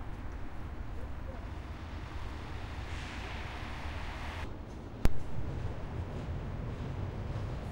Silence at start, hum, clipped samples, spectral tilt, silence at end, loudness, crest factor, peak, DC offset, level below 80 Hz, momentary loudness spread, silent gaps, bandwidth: 0 s; none; under 0.1%; -6.5 dB/octave; 0 s; -41 LUFS; 24 dB; -12 dBFS; under 0.1%; -42 dBFS; 6 LU; none; 16 kHz